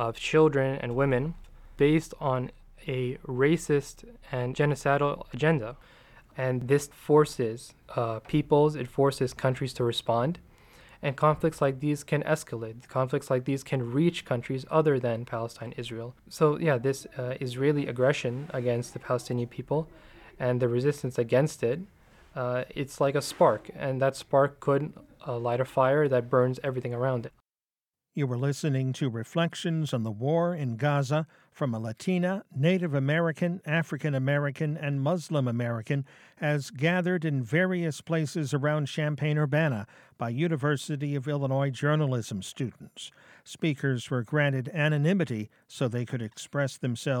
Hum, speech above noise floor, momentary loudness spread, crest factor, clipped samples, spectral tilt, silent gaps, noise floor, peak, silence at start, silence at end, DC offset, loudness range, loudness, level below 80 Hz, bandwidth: none; over 62 dB; 11 LU; 18 dB; under 0.1%; -6.5 dB/octave; none; under -90 dBFS; -10 dBFS; 0 s; 0 s; under 0.1%; 3 LU; -28 LUFS; -58 dBFS; 14.5 kHz